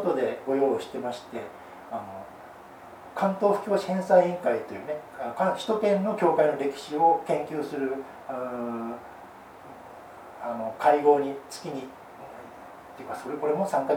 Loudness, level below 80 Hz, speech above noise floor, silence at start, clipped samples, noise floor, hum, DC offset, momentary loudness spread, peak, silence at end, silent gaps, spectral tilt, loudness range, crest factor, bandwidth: -27 LUFS; -70 dBFS; 20 dB; 0 s; under 0.1%; -46 dBFS; none; under 0.1%; 23 LU; -8 dBFS; 0 s; none; -6 dB/octave; 6 LU; 20 dB; 19 kHz